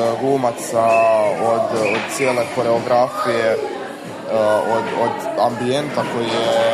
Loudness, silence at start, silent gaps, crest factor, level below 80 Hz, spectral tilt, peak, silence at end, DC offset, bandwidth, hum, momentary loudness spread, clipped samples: -18 LUFS; 0 s; none; 14 dB; -62 dBFS; -4.5 dB/octave; -4 dBFS; 0 s; under 0.1%; 14 kHz; none; 6 LU; under 0.1%